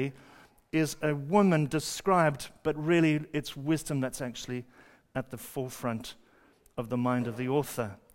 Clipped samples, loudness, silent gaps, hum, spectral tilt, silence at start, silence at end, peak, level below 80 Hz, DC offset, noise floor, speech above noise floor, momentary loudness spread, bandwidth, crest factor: under 0.1%; -30 LUFS; none; none; -6 dB/octave; 0 s; 0.2 s; -10 dBFS; -62 dBFS; under 0.1%; -62 dBFS; 33 dB; 13 LU; 16 kHz; 20 dB